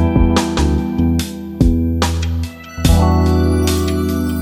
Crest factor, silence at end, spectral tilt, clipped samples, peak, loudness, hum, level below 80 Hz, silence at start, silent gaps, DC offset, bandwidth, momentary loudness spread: 14 dB; 0 s; -6 dB/octave; under 0.1%; 0 dBFS; -16 LUFS; none; -20 dBFS; 0 s; none; under 0.1%; 16.5 kHz; 7 LU